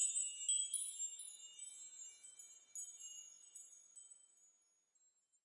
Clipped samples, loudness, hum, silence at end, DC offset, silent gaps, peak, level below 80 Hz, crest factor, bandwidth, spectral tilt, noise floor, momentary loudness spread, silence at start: under 0.1%; -43 LUFS; none; 0.95 s; under 0.1%; none; -26 dBFS; under -90 dBFS; 22 dB; 11.5 kHz; 6 dB/octave; -79 dBFS; 21 LU; 0 s